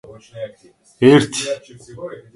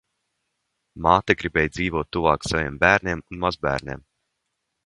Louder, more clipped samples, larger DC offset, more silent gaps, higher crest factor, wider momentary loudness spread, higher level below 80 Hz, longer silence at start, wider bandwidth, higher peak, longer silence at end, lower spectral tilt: first, -15 LUFS vs -22 LUFS; neither; neither; neither; second, 18 dB vs 24 dB; first, 21 LU vs 10 LU; second, -58 dBFS vs -42 dBFS; second, 0.35 s vs 0.95 s; about the same, 11.5 kHz vs 11.5 kHz; about the same, 0 dBFS vs 0 dBFS; second, 0.15 s vs 0.85 s; about the same, -5.5 dB/octave vs -5 dB/octave